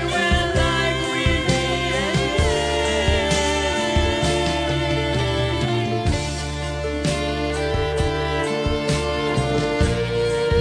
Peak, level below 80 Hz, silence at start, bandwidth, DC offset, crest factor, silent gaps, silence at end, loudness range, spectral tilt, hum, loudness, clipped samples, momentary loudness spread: -6 dBFS; -30 dBFS; 0 s; 11 kHz; under 0.1%; 14 dB; none; 0 s; 3 LU; -4.5 dB/octave; none; -21 LUFS; under 0.1%; 4 LU